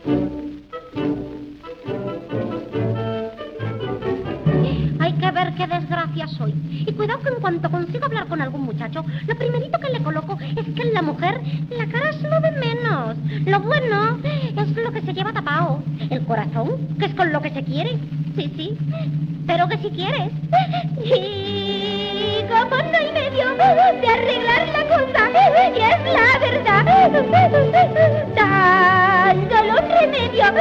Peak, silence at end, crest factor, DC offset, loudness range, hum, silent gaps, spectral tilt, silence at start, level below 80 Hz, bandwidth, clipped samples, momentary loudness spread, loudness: -2 dBFS; 0 s; 16 dB; under 0.1%; 9 LU; none; none; -7.5 dB/octave; 0 s; -46 dBFS; 6.8 kHz; under 0.1%; 13 LU; -19 LUFS